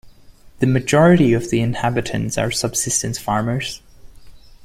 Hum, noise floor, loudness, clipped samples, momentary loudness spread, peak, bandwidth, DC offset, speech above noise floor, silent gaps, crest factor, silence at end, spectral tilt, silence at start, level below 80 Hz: none; -44 dBFS; -18 LUFS; under 0.1%; 10 LU; -2 dBFS; 16 kHz; under 0.1%; 27 dB; none; 18 dB; 0.25 s; -5 dB/octave; 0.05 s; -44 dBFS